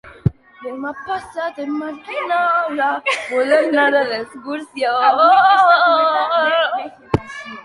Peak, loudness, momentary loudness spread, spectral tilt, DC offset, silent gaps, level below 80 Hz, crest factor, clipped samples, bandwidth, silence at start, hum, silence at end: -2 dBFS; -16 LUFS; 16 LU; -5.5 dB/octave; under 0.1%; none; -46 dBFS; 16 dB; under 0.1%; 11.5 kHz; 0.05 s; none; 0 s